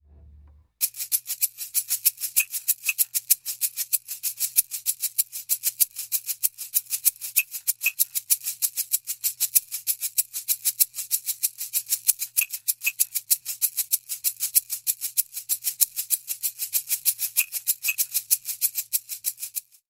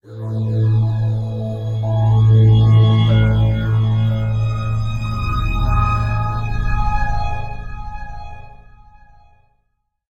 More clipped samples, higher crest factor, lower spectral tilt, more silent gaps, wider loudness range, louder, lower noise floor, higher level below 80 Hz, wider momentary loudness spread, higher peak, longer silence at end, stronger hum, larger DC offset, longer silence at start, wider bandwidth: neither; first, 28 dB vs 12 dB; second, 4.5 dB/octave vs -8.5 dB/octave; neither; second, 1 LU vs 11 LU; second, -24 LUFS vs -17 LUFS; second, -52 dBFS vs -68 dBFS; second, -66 dBFS vs -26 dBFS; second, 5 LU vs 18 LU; first, 0 dBFS vs -4 dBFS; second, 0.3 s vs 1.55 s; neither; neither; first, 0.25 s vs 0.05 s; first, 17 kHz vs 5.4 kHz